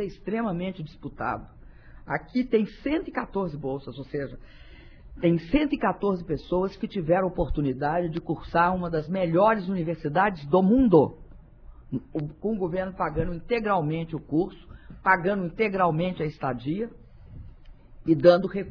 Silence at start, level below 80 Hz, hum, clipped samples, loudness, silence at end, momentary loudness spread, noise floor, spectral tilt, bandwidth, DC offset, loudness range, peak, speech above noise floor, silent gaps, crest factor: 0 s; -44 dBFS; none; under 0.1%; -26 LUFS; 0 s; 12 LU; -47 dBFS; -9.5 dB/octave; 5.4 kHz; under 0.1%; 6 LU; -4 dBFS; 22 dB; none; 22 dB